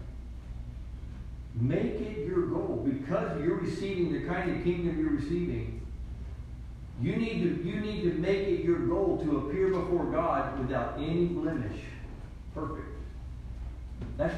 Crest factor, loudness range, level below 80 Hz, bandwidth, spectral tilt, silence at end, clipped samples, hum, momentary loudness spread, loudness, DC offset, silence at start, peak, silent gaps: 16 dB; 4 LU; -44 dBFS; 9.6 kHz; -8.5 dB/octave; 0 s; under 0.1%; none; 15 LU; -31 LUFS; under 0.1%; 0 s; -16 dBFS; none